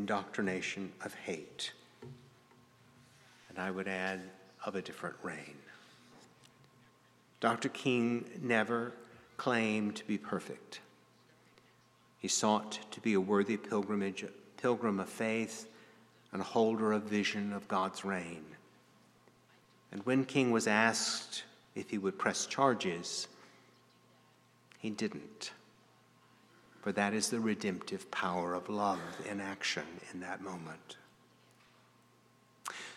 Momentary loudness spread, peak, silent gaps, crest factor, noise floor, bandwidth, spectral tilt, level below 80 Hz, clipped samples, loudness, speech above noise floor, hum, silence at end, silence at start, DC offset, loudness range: 16 LU; -12 dBFS; none; 24 dB; -67 dBFS; 14 kHz; -4 dB/octave; -82 dBFS; under 0.1%; -36 LUFS; 31 dB; 60 Hz at -70 dBFS; 0 s; 0 s; under 0.1%; 9 LU